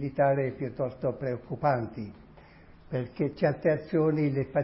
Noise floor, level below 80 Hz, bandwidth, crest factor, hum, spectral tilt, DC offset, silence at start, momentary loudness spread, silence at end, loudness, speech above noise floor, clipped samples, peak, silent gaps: -53 dBFS; -58 dBFS; 5.8 kHz; 16 dB; none; -12 dB/octave; under 0.1%; 0 s; 10 LU; 0 s; -29 LUFS; 24 dB; under 0.1%; -12 dBFS; none